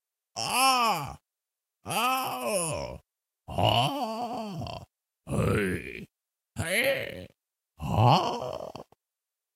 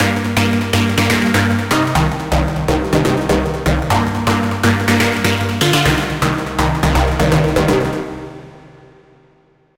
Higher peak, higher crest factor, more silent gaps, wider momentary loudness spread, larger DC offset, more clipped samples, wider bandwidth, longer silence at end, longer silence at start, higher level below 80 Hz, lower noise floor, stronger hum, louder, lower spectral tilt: second, -8 dBFS vs -2 dBFS; first, 22 dB vs 14 dB; neither; first, 19 LU vs 4 LU; neither; neither; about the same, 16.5 kHz vs 17 kHz; second, 0.75 s vs 1.1 s; first, 0.35 s vs 0 s; second, -52 dBFS vs -26 dBFS; first, -90 dBFS vs -53 dBFS; neither; second, -28 LUFS vs -15 LUFS; about the same, -4 dB/octave vs -5 dB/octave